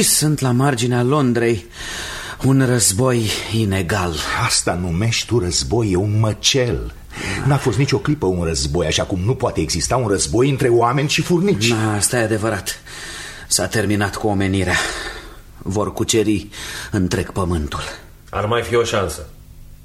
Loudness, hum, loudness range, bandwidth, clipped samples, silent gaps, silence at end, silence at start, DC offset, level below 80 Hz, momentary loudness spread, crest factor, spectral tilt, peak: -18 LUFS; none; 4 LU; 16 kHz; under 0.1%; none; 0 s; 0 s; under 0.1%; -36 dBFS; 12 LU; 16 dB; -4.5 dB/octave; -2 dBFS